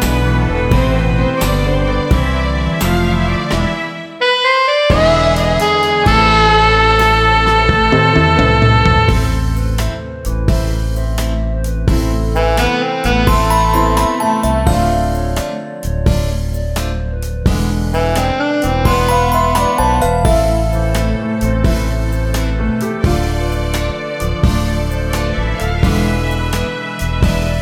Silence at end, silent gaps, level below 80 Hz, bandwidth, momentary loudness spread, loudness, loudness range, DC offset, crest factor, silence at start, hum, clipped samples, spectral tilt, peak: 0 s; none; -18 dBFS; 17 kHz; 9 LU; -14 LUFS; 6 LU; under 0.1%; 14 dB; 0 s; none; under 0.1%; -5.5 dB/octave; 0 dBFS